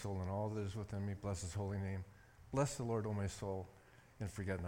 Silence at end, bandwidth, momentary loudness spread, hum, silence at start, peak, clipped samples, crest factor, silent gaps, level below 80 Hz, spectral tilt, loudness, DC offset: 0 s; 16.5 kHz; 9 LU; none; 0 s; -24 dBFS; under 0.1%; 18 dB; none; -62 dBFS; -6.5 dB/octave; -43 LUFS; under 0.1%